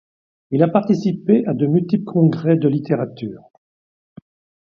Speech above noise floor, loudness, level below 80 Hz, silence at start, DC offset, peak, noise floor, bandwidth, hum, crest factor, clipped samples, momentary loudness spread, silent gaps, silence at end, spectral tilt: over 73 dB; -18 LUFS; -62 dBFS; 0.5 s; under 0.1%; 0 dBFS; under -90 dBFS; 6.6 kHz; none; 18 dB; under 0.1%; 8 LU; none; 1.3 s; -9.5 dB/octave